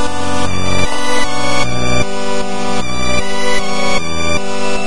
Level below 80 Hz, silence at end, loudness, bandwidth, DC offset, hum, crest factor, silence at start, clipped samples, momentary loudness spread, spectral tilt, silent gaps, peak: -32 dBFS; 0 s; -17 LUFS; 11.5 kHz; 40%; none; 16 dB; 0 s; under 0.1%; 3 LU; -3.5 dB/octave; none; 0 dBFS